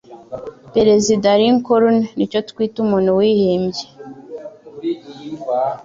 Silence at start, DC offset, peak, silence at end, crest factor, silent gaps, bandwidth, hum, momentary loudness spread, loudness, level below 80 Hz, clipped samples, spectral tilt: 0.1 s; under 0.1%; -2 dBFS; 0 s; 14 dB; none; 7.8 kHz; none; 20 LU; -16 LUFS; -54 dBFS; under 0.1%; -5.5 dB/octave